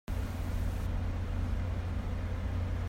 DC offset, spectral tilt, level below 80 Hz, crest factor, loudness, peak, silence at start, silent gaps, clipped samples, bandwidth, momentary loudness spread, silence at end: under 0.1%; -7 dB/octave; -36 dBFS; 10 dB; -36 LUFS; -24 dBFS; 0.1 s; none; under 0.1%; 16 kHz; 2 LU; 0 s